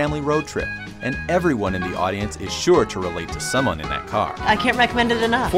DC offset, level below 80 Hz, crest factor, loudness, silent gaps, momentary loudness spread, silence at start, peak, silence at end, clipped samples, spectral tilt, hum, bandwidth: under 0.1%; -38 dBFS; 18 dB; -21 LUFS; none; 9 LU; 0 s; -4 dBFS; 0 s; under 0.1%; -4.5 dB/octave; none; 16 kHz